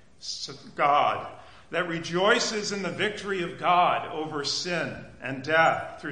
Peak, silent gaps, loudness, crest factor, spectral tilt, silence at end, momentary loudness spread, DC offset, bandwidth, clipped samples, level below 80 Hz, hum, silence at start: -8 dBFS; none; -26 LUFS; 18 dB; -3.5 dB/octave; 0 s; 13 LU; 0.2%; 10.5 kHz; under 0.1%; -62 dBFS; none; 0.2 s